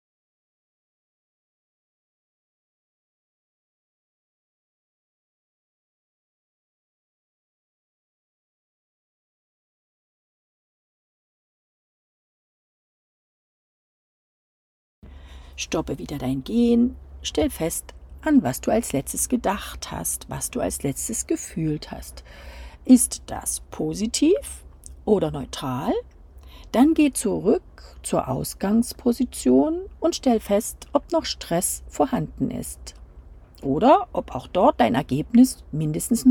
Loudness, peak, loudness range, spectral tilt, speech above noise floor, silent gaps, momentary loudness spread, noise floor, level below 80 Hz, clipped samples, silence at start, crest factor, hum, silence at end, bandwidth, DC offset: -23 LUFS; -4 dBFS; 5 LU; -5 dB/octave; 23 dB; none; 15 LU; -45 dBFS; -46 dBFS; under 0.1%; 15.05 s; 22 dB; none; 0 s; 18 kHz; under 0.1%